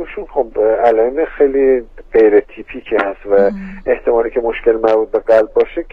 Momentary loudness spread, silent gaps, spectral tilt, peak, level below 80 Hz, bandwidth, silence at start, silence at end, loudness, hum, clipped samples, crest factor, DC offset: 8 LU; none; -7.5 dB/octave; 0 dBFS; -38 dBFS; 5.4 kHz; 0 s; 0.05 s; -14 LUFS; none; under 0.1%; 14 dB; 0.2%